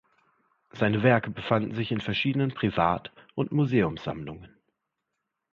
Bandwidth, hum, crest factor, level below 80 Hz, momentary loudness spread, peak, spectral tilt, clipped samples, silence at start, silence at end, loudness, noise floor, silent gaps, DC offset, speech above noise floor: 7 kHz; none; 20 dB; -56 dBFS; 13 LU; -8 dBFS; -8 dB/octave; under 0.1%; 0.75 s; 1.05 s; -27 LUFS; -83 dBFS; none; under 0.1%; 56 dB